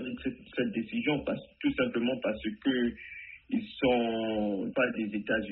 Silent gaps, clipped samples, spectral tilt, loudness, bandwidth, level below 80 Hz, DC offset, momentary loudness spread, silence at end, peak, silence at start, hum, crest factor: none; under 0.1%; -4 dB/octave; -31 LUFS; 4.2 kHz; -58 dBFS; under 0.1%; 8 LU; 0 s; -14 dBFS; 0 s; none; 18 dB